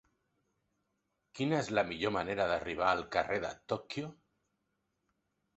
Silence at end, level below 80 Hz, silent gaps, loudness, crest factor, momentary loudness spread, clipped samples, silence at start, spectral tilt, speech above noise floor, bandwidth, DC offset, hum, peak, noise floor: 1.45 s; -64 dBFS; none; -34 LUFS; 24 dB; 10 LU; under 0.1%; 1.35 s; -3.5 dB/octave; 48 dB; 8 kHz; under 0.1%; none; -14 dBFS; -82 dBFS